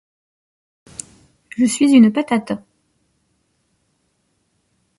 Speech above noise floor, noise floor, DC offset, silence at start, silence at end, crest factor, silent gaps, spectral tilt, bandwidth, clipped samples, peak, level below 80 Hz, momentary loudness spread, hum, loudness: 53 dB; -67 dBFS; under 0.1%; 1.6 s; 2.4 s; 20 dB; none; -5 dB/octave; 11.5 kHz; under 0.1%; -2 dBFS; -62 dBFS; 23 LU; none; -16 LUFS